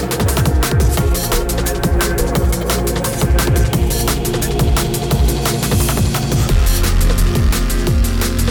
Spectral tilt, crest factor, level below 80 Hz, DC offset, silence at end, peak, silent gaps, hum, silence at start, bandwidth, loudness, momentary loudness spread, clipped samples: -5 dB/octave; 10 dB; -18 dBFS; under 0.1%; 0 s; -4 dBFS; none; none; 0 s; 19.5 kHz; -16 LUFS; 2 LU; under 0.1%